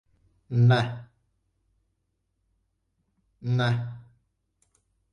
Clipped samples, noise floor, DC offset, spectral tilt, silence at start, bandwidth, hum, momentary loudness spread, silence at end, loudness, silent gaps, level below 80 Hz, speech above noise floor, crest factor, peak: under 0.1%; -76 dBFS; under 0.1%; -7.5 dB/octave; 0.5 s; 9.2 kHz; none; 19 LU; 1.1 s; -25 LUFS; none; -62 dBFS; 54 dB; 20 dB; -10 dBFS